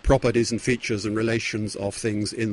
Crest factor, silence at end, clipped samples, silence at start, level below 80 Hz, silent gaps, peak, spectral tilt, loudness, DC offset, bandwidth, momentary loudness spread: 16 dB; 0 s; under 0.1%; 0.05 s; -36 dBFS; none; -6 dBFS; -5 dB/octave; -25 LUFS; under 0.1%; 11.5 kHz; 7 LU